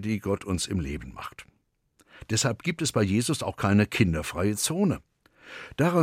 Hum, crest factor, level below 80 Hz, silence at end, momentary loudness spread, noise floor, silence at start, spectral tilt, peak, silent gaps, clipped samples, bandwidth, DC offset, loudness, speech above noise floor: none; 20 dB; -48 dBFS; 0 s; 16 LU; -67 dBFS; 0 s; -5 dB/octave; -8 dBFS; none; under 0.1%; 16 kHz; under 0.1%; -27 LUFS; 41 dB